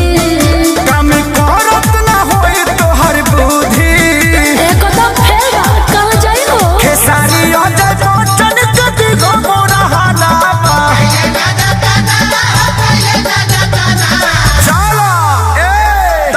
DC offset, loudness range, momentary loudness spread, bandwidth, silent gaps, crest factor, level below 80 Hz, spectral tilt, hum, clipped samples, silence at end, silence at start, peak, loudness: under 0.1%; 1 LU; 2 LU; 16 kHz; none; 8 dB; -18 dBFS; -4 dB/octave; none; 0.1%; 0 s; 0 s; 0 dBFS; -8 LUFS